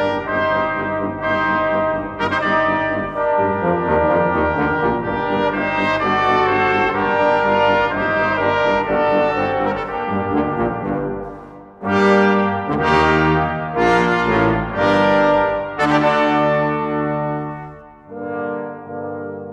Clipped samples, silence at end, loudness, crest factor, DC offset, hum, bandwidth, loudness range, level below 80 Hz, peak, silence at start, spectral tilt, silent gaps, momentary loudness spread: under 0.1%; 0 s; -17 LUFS; 16 dB; under 0.1%; none; 9.4 kHz; 3 LU; -42 dBFS; -2 dBFS; 0 s; -7 dB/octave; none; 11 LU